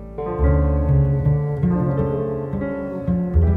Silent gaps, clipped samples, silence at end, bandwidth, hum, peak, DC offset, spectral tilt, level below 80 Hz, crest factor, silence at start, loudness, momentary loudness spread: none; under 0.1%; 0 s; 3.3 kHz; none; -6 dBFS; under 0.1%; -12 dB/octave; -24 dBFS; 14 dB; 0 s; -21 LUFS; 7 LU